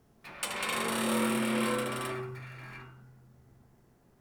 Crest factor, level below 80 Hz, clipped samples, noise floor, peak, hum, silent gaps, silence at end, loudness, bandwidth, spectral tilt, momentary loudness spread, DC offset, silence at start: 18 dB; -66 dBFS; under 0.1%; -63 dBFS; -18 dBFS; none; none; 0.95 s; -31 LUFS; over 20 kHz; -3.5 dB/octave; 18 LU; under 0.1%; 0.25 s